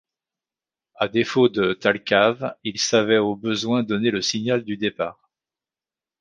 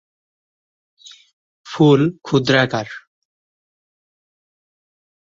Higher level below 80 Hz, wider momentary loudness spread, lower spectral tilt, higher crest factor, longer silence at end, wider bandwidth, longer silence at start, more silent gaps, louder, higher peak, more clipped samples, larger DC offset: about the same, -62 dBFS vs -60 dBFS; second, 9 LU vs 20 LU; second, -4 dB/octave vs -6.5 dB/octave; about the same, 20 dB vs 20 dB; second, 1.1 s vs 2.35 s; first, 9.6 kHz vs 7.6 kHz; second, 1 s vs 1.65 s; neither; second, -21 LUFS vs -16 LUFS; about the same, -2 dBFS vs -2 dBFS; neither; neither